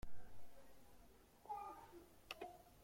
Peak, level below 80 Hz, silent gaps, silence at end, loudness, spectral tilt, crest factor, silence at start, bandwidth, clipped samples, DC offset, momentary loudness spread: -34 dBFS; -66 dBFS; none; 0 s; -56 LUFS; -4 dB/octave; 16 dB; 0.05 s; 16.5 kHz; under 0.1%; under 0.1%; 16 LU